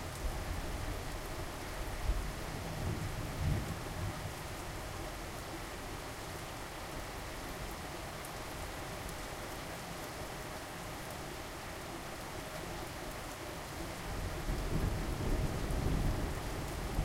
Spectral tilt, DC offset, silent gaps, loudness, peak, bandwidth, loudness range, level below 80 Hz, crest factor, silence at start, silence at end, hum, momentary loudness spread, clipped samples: -4.5 dB/octave; under 0.1%; none; -41 LUFS; -22 dBFS; 16 kHz; 5 LU; -44 dBFS; 18 dB; 0 s; 0 s; none; 7 LU; under 0.1%